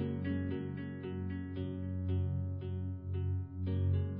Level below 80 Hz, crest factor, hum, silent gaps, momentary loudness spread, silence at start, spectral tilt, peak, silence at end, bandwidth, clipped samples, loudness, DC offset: -44 dBFS; 14 dB; none; none; 6 LU; 0 s; -9 dB/octave; -24 dBFS; 0 s; 4 kHz; under 0.1%; -38 LUFS; under 0.1%